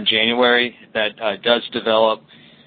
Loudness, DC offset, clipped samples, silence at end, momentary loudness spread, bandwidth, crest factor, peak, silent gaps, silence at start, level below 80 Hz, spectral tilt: -18 LUFS; under 0.1%; under 0.1%; 0.5 s; 7 LU; 4.7 kHz; 18 dB; -2 dBFS; none; 0 s; -60 dBFS; -8.5 dB/octave